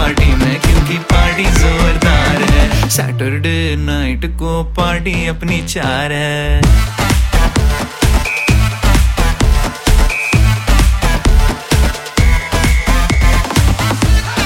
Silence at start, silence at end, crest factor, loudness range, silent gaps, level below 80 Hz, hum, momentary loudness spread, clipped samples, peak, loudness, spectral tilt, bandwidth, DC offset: 0 s; 0 s; 12 dB; 3 LU; none; -14 dBFS; none; 5 LU; under 0.1%; 0 dBFS; -13 LUFS; -5 dB/octave; 16.5 kHz; under 0.1%